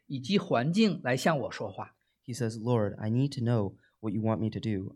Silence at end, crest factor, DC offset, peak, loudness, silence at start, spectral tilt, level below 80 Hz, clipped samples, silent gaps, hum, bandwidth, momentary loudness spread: 0 s; 18 dB; under 0.1%; -12 dBFS; -30 LUFS; 0.1 s; -6.5 dB/octave; -68 dBFS; under 0.1%; none; none; 14 kHz; 12 LU